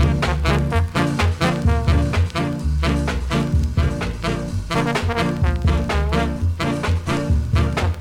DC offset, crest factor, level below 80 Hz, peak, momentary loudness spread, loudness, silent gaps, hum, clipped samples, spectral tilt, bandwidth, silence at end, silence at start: under 0.1%; 14 dB; -24 dBFS; -6 dBFS; 4 LU; -20 LUFS; none; none; under 0.1%; -6.5 dB/octave; 13 kHz; 0 s; 0 s